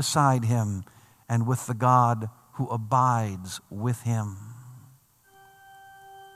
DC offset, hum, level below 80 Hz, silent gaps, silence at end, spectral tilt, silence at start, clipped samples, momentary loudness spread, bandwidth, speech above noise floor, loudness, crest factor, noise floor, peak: under 0.1%; none; -70 dBFS; none; 0.05 s; -6 dB/octave; 0 s; under 0.1%; 15 LU; 15 kHz; 33 dB; -26 LUFS; 20 dB; -58 dBFS; -6 dBFS